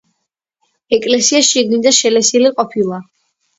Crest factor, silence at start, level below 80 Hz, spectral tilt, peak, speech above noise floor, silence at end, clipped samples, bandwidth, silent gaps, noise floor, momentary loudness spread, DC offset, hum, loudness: 14 dB; 0.9 s; -60 dBFS; -2 dB/octave; 0 dBFS; 61 dB; 0.55 s; under 0.1%; 8.2 kHz; none; -73 dBFS; 9 LU; under 0.1%; none; -12 LUFS